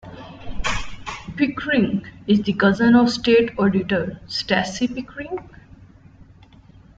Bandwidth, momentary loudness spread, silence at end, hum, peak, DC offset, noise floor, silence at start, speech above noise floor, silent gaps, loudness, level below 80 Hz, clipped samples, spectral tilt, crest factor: 7.8 kHz; 17 LU; 0.75 s; none; -2 dBFS; under 0.1%; -48 dBFS; 0.05 s; 29 dB; none; -20 LUFS; -40 dBFS; under 0.1%; -5.5 dB/octave; 18 dB